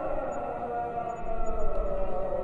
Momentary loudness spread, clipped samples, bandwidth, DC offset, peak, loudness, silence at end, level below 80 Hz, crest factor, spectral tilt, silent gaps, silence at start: 2 LU; under 0.1%; 7.4 kHz; under 0.1%; -14 dBFS; -33 LUFS; 0 s; -34 dBFS; 14 dB; -7.5 dB/octave; none; 0 s